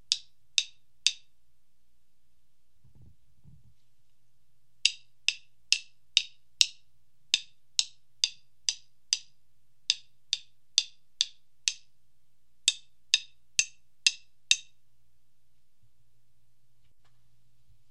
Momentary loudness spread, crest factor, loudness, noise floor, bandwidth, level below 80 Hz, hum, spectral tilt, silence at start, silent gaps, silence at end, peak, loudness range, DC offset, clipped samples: 13 LU; 36 dB; -29 LUFS; -77 dBFS; 16 kHz; -74 dBFS; 60 Hz at -80 dBFS; 4.5 dB/octave; 0.1 s; none; 3.3 s; 0 dBFS; 6 LU; 0.3%; under 0.1%